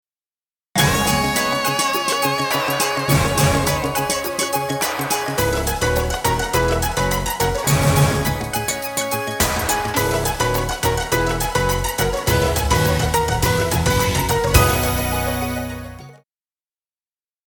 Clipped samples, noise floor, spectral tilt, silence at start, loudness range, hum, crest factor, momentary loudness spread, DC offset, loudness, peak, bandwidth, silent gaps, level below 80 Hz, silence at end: under 0.1%; under -90 dBFS; -4 dB/octave; 0.75 s; 2 LU; none; 20 dB; 5 LU; under 0.1%; -19 LUFS; 0 dBFS; 19.5 kHz; none; -30 dBFS; 1.3 s